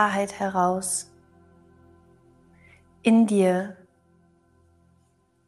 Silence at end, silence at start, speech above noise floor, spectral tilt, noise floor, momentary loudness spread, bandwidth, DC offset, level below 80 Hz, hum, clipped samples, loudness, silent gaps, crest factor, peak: 1.75 s; 0 s; 43 dB; -5 dB/octave; -65 dBFS; 10 LU; 12.5 kHz; under 0.1%; -68 dBFS; none; under 0.1%; -23 LUFS; none; 20 dB; -6 dBFS